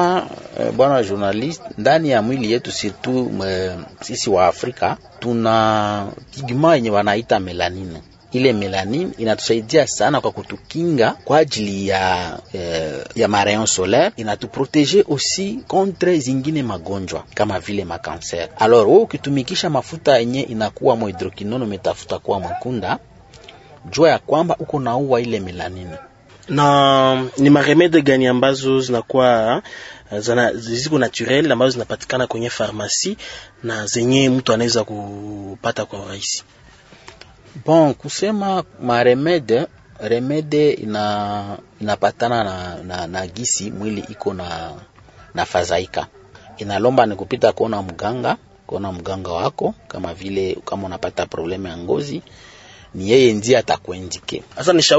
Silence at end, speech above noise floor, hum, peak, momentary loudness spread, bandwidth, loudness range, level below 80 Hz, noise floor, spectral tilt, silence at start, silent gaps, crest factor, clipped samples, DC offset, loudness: 0 s; 28 dB; none; 0 dBFS; 13 LU; 8 kHz; 7 LU; -52 dBFS; -46 dBFS; -4.5 dB/octave; 0 s; none; 18 dB; under 0.1%; under 0.1%; -18 LUFS